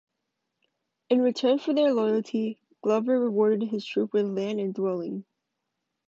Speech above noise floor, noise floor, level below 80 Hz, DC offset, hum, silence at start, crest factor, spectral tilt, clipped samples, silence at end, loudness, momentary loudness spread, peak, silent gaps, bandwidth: 57 dB; -82 dBFS; -80 dBFS; under 0.1%; none; 1.1 s; 16 dB; -6.5 dB/octave; under 0.1%; 0.85 s; -26 LUFS; 9 LU; -10 dBFS; none; 7.8 kHz